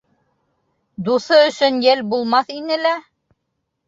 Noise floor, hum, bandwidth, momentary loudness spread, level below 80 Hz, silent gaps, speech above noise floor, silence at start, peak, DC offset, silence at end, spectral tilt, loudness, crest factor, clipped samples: -74 dBFS; none; 7.8 kHz; 9 LU; -66 dBFS; none; 58 dB; 1 s; -2 dBFS; under 0.1%; 0.9 s; -4.5 dB/octave; -17 LUFS; 16 dB; under 0.1%